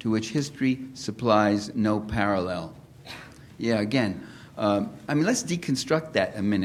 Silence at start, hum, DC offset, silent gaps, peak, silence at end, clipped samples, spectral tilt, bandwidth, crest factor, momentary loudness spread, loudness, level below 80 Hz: 0 s; none; under 0.1%; none; -6 dBFS; 0 s; under 0.1%; -5.5 dB/octave; 14.5 kHz; 20 dB; 18 LU; -26 LUFS; -54 dBFS